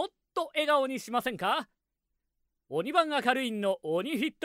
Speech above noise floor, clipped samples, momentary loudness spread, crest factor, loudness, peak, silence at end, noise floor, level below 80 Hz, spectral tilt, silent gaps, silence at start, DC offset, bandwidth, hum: 54 dB; under 0.1%; 8 LU; 20 dB; -30 LUFS; -10 dBFS; 0 s; -83 dBFS; -74 dBFS; -4 dB/octave; none; 0 s; under 0.1%; 16 kHz; none